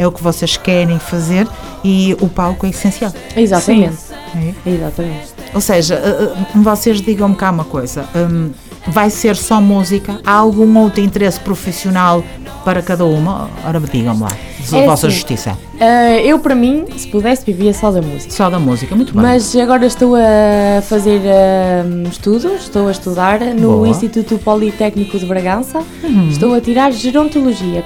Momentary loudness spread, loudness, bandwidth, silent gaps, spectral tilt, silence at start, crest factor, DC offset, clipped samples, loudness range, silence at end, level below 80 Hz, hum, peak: 10 LU; -12 LUFS; 18.5 kHz; none; -6 dB/octave; 0 s; 12 dB; under 0.1%; 0.3%; 4 LU; 0 s; -34 dBFS; none; 0 dBFS